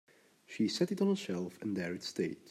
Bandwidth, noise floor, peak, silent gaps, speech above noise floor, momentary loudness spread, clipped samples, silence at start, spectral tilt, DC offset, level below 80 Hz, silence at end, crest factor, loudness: 15 kHz; -55 dBFS; -18 dBFS; none; 20 dB; 7 LU; under 0.1%; 0.5 s; -5.5 dB/octave; under 0.1%; -82 dBFS; 0 s; 18 dB; -35 LUFS